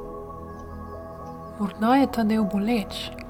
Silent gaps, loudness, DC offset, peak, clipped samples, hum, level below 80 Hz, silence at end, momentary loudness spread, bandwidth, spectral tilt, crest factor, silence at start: none; -24 LUFS; under 0.1%; -8 dBFS; under 0.1%; none; -48 dBFS; 0 s; 18 LU; 18 kHz; -6.5 dB/octave; 18 dB; 0 s